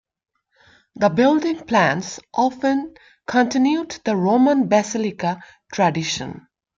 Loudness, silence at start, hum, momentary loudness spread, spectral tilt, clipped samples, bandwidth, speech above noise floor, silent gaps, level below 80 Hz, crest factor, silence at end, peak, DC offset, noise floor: -20 LUFS; 0.95 s; none; 11 LU; -5 dB/octave; under 0.1%; 7.6 kHz; 36 dB; none; -60 dBFS; 16 dB; 0.4 s; -4 dBFS; under 0.1%; -56 dBFS